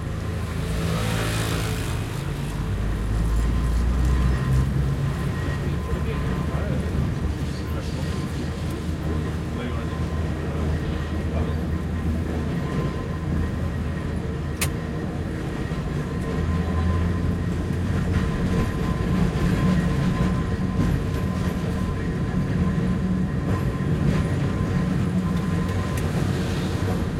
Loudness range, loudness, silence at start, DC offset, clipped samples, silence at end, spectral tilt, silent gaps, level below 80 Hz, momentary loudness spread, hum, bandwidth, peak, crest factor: 4 LU; -25 LUFS; 0 s; under 0.1%; under 0.1%; 0 s; -7 dB/octave; none; -30 dBFS; 6 LU; none; 16.5 kHz; -10 dBFS; 14 dB